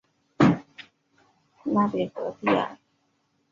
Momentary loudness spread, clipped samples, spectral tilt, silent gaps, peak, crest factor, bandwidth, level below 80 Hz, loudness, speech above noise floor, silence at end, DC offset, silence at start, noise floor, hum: 15 LU; under 0.1%; -7.5 dB/octave; none; -6 dBFS; 22 dB; 7.4 kHz; -62 dBFS; -25 LUFS; 45 dB; 0.8 s; under 0.1%; 0.4 s; -71 dBFS; none